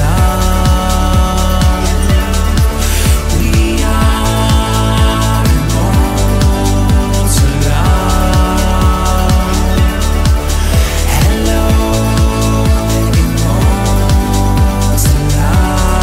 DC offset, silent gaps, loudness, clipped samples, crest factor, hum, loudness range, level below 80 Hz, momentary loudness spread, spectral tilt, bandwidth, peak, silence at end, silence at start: under 0.1%; none; -12 LUFS; under 0.1%; 10 dB; none; 1 LU; -12 dBFS; 1 LU; -5 dB/octave; 16.5 kHz; 0 dBFS; 0 s; 0 s